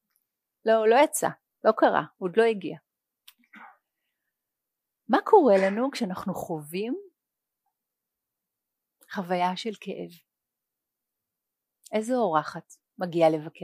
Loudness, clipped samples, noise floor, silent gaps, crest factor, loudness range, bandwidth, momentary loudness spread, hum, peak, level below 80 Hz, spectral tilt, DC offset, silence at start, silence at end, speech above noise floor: -25 LUFS; under 0.1%; -87 dBFS; none; 22 dB; 10 LU; 15.5 kHz; 17 LU; none; -6 dBFS; -76 dBFS; -5 dB/octave; under 0.1%; 0.65 s; 0.15 s; 62 dB